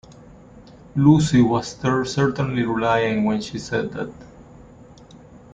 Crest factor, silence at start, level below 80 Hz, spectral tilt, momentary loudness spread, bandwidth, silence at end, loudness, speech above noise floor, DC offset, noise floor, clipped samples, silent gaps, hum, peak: 18 dB; 0.55 s; -48 dBFS; -6.5 dB/octave; 12 LU; 9.4 kHz; 0.6 s; -20 LUFS; 26 dB; under 0.1%; -45 dBFS; under 0.1%; none; none; -4 dBFS